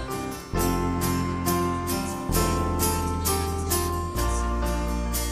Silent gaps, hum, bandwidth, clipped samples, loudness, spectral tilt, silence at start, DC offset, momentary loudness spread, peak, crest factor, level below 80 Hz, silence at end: none; none; 15.5 kHz; under 0.1%; -26 LUFS; -4.5 dB/octave; 0 s; under 0.1%; 4 LU; -10 dBFS; 16 dB; -32 dBFS; 0 s